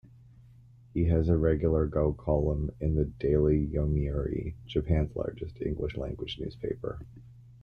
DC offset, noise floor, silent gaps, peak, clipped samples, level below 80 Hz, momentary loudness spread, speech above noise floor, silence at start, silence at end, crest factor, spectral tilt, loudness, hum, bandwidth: under 0.1%; -55 dBFS; none; -12 dBFS; under 0.1%; -38 dBFS; 11 LU; 26 dB; 0.95 s; 0.1 s; 18 dB; -10 dB/octave; -30 LUFS; none; 5 kHz